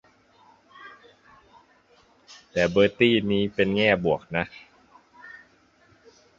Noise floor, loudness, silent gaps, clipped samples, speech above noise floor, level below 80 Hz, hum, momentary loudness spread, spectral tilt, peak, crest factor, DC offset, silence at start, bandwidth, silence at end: -60 dBFS; -23 LUFS; none; under 0.1%; 37 dB; -56 dBFS; none; 26 LU; -6 dB/octave; -4 dBFS; 22 dB; under 0.1%; 0.8 s; 7.6 kHz; 1 s